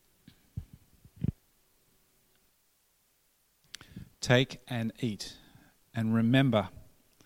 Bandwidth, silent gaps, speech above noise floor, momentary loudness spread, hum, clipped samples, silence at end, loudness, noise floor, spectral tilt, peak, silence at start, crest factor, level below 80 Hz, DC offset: 16 kHz; none; 43 dB; 23 LU; none; under 0.1%; 0.55 s; -30 LUFS; -71 dBFS; -6 dB/octave; -8 dBFS; 0.55 s; 26 dB; -56 dBFS; under 0.1%